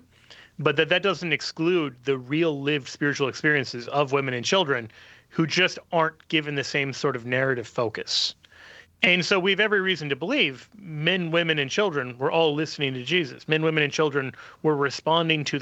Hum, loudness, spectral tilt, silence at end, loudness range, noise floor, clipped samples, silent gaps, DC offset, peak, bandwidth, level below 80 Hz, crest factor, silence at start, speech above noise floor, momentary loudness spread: none; -24 LUFS; -4.5 dB/octave; 0 s; 2 LU; -52 dBFS; under 0.1%; none; under 0.1%; -2 dBFS; 8.4 kHz; -68 dBFS; 24 dB; 0.3 s; 27 dB; 7 LU